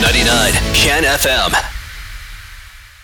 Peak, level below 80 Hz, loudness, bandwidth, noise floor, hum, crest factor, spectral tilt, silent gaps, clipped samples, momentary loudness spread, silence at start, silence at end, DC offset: -2 dBFS; -24 dBFS; -12 LUFS; 19 kHz; -37 dBFS; none; 14 dB; -2.5 dB/octave; none; under 0.1%; 21 LU; 0 s; 0.15 s; under 0.1%